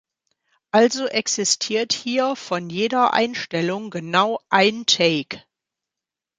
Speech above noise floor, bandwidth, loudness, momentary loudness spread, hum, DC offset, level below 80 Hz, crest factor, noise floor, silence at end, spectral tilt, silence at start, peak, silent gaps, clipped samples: 67 dB; 9.6 kHz; -20 LUFS; 9 LU; none; under 0.1%; -68 dBFS; 20 dB; -87 dBFS; 1 s; -3 dB/octave; 0.75 s; -2 dBFS; none; under 0.1%